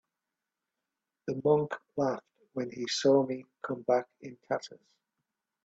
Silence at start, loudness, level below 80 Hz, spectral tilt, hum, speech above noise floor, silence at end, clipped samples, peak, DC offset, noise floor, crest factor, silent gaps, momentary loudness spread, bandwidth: 1.25 s; -31 LUFS; -76 dBFS; -5 dB/octave; none; 58 dB; 0.9 s; under 0.1%; -14 dBFS; under 0.1%; -88 dBFS; 20 dB; none; 17 LU; 8 kHz